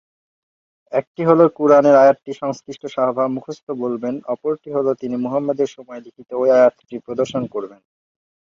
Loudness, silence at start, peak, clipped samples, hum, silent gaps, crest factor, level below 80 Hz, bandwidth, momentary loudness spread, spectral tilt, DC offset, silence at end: -18 LUFS; 0.9 s; -2 dBFS; under 0.1%; none; 1.07-1.14 s, 3.63-3.67 s; 16 dB; -64 dBFS; 7.4 kHz; 17 LU; -7 dB/octave; under 0.1%; 0.8 s